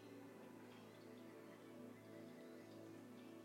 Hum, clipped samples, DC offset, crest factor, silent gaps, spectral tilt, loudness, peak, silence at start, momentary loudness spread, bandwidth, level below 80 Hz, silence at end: none; under 0.1%; under 0.1%; 12 dB; none; -5.5 dB/octave; -59 LUFS; -46 dBFS; 0 s; 1 LU; 16.5 kHz; under -90 dBFS; 0 s